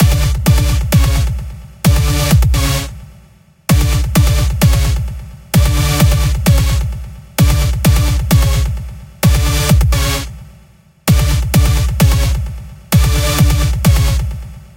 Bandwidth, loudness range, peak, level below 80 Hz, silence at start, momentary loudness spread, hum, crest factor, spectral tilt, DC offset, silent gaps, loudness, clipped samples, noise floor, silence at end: 17.5 kHz; 2 LU; 0 dBFS; -16 dBFS; 0 s; 11 LU; none; 12 dB; -5 dB/octave; under 0.1%; none; -13 LUFS; under 0.1%; -45 dBFS; 0.1 s